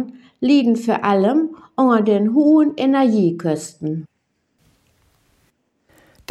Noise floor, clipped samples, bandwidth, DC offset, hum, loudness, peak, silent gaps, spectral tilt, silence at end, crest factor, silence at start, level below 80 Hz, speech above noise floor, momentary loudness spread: -69 dBFS; under 0.1%; 11.5 kHz; under 0.1%; none; -17 LUFS; -2 dBFS; none; -7 dB/octave; 2.25 s; 16 dB; 0 s; -68 dBFS; 52 dB; 12 LU